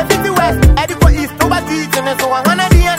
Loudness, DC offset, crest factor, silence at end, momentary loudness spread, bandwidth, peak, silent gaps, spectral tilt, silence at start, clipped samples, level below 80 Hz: -12 LUFS; under 0.1%; 12 dB; 0 s; 5 LU; 16.5 kHz; 0 dBFS; none; -5 dB/octave; 0 s; under 0.1%; -16 dBFS